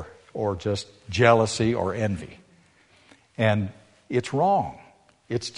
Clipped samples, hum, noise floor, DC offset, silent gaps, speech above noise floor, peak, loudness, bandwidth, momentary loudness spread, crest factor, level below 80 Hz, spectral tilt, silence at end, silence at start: under 0.1%; none; -58 dBFS; under 0.1%; none; 35 dB; -4 dBFS; -25 LUFS; 10.5 kHz; 16 LU; 22 dB; -54 dBFS; -5.5 dB/octave; 0 s; 0 s